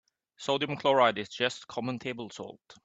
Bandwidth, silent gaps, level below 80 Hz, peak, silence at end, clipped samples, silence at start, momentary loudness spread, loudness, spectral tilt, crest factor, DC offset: 8.4 kHz; none; -74 dBFS; -10 dBFS; 0.1 s; under 0.1%; 0.4 s; 17 LU; -30 LUFS; -4.5 dB/octave; 22 dB; under 0.1%